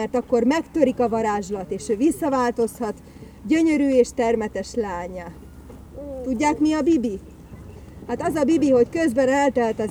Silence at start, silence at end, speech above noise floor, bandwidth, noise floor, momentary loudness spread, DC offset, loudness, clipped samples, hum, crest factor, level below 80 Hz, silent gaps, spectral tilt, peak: 0 s; 0 s; 20 dB; 16.5 kHz; -41 dBFS; 20 LU; under 0.1%; -21 LUFS; under 0.1%; none; 18 dB; -46 dBFS; none; -5.5 dB/octave; -4 dBFS